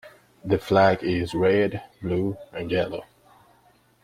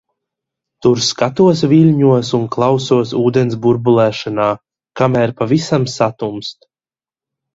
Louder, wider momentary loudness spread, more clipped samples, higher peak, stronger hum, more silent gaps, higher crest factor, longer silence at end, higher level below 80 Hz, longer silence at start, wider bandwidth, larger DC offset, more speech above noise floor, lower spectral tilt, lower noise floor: second, -24 LUFS vs -14 LUFS; first, 15 LU vs 8 LU; neither; second, -4 dBFS vs 0 dBFS; neither; neither; first, 20 dB vs 14 dB; about the same, 1 s vs 1 s; about the same, -54 dBFS vs -52 dBFS; second, 0.05 s vs 0.85 s; first, 15.5 kHz vs 8 kHz; neither; second, 37 dB vs over 77 dB; about the same, -7 dB/octave vs -6.5 dB/octave; second, -60 dBFS vs under -90 dBFS